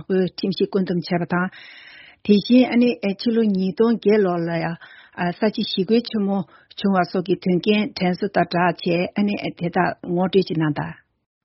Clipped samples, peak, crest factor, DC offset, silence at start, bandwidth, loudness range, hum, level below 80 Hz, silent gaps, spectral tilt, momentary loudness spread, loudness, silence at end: under 0.1%; -4 dBFS; 18 dB; under 0.1%; 0 s; 6 kHz; 3 LU; none; -60 dBFS; none; -5.5 dB/octave; 10 LU; -21 LUFS; 0.5 s